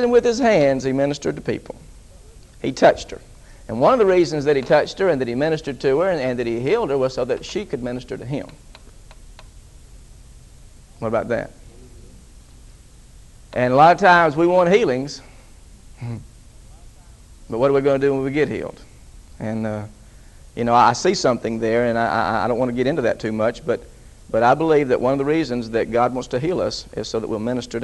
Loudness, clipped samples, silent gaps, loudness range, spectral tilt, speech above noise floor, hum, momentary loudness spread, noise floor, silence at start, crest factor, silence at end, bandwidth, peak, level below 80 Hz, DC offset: -19 LUFS; under 0.1%; none; 13 LU; -5.5 dB/octave; 26 dB; none; 15 LU; -44 dBFS; 0 s; 20 dB; 0 s; 12 kHz; 0 dBFS; -44 dBFS; under 0.1%